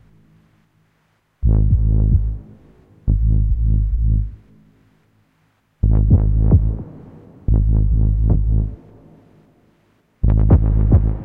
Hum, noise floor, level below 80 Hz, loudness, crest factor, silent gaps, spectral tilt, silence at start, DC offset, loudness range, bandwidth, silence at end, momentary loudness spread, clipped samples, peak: none; -63 dBFS; -20 dBFS; -18 LUFS; 14 dB; none; -13.5 dB/octave; 1.4 s; under 0.1%; 4 LU; 1.8 kHz; 0 s; 12 LU; under 0.1%; -2 dBFS